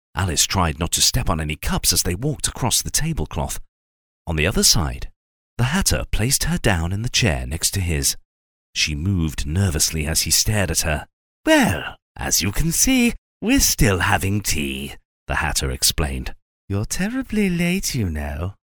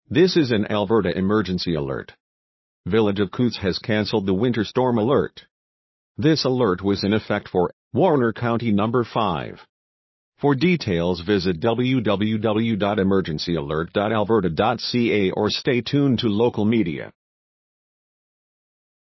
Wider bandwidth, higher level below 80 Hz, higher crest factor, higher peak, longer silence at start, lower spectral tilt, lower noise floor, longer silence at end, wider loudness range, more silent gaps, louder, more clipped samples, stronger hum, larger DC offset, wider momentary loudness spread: first, over 20 kHz vs 6.2 kHz; first, -30 dBFS vs -48 dBFS; about the same, 20 dB vs 16 dB; first, -2 dBFS vs -6 dBFS; about the same, 0.15 s vs 0.1 s; second, -3 dB/octave vs -7 dB/octave; about the same, under -90 dBFS vs under -90 dBFS; second, 0.2 s vs 2 s; about the same, 3 LU vs 2 LU; first, 3.68-4.25 s, 5.16-5.57 s, 8.25-8.73 s, 11.13-11.44 s, 12.02-12.15 s, 13.18-13.40 s, 15.05-15.26 s, 16.42-16.68 s vs 2.20-2.84 s, 5.51-6.15 s, 7.73-7.91 s, 9.69-10.32 s; about the same, -20 LUFS vs -21 LUFS; neither; neither; neither; first, 12 LU vs 5 LU